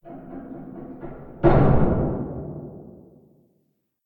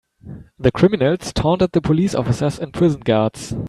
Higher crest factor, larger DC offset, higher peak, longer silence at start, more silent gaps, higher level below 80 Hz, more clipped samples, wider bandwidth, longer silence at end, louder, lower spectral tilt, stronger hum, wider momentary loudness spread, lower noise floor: about the same, 20 dB vs 16 dB; neither; about the same, -4 dBFS vs -2 dBFS; second, 0.05 s vs 0.25 s; neither; first, -32 dBFS vs -40 dBFS; neither; second, 4.5 kHz vs 12.5 kHz; first, 1.2 s vs 0 s; second, -21 LUFS vs -18 LUFS; first, -12 dB/octave vs -7 dB/octave; neither; first, 21 LU vs 7 LU; first, -70 dBFS vs -38 dBFS